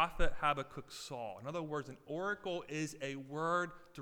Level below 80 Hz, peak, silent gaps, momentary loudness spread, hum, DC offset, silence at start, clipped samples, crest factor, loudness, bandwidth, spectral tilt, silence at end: -48 dBFS; -18 dBFS; none; 9 LU; none; under 0.1%; 0 s; under 0.1%; 20 dB; -40 LUFS; 13 kHz; -4.5 dB/octave; 0 s